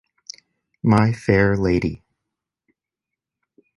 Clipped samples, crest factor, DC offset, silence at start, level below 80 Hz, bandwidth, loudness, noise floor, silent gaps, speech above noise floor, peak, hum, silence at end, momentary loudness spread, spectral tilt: under 0.1%; 20 dB; under 0.1%; 0.85 s; -42 dBFS; 11.5 kHz; -19 LUFS; -86 dBFS; none; 68 dB; -2 dBFS; none; 1.8 s; 22 LU; -7.5 dB/octave